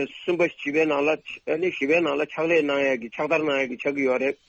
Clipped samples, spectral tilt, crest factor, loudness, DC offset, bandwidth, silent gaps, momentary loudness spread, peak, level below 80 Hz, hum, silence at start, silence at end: under 0.1%; -5 dB/octave; 16 dB; -24 LUFS; under 0.1%; 7.8 kHz; none; 5 LU; -8 dBFS; -68 dBFS; none; 0 s; 0.15 s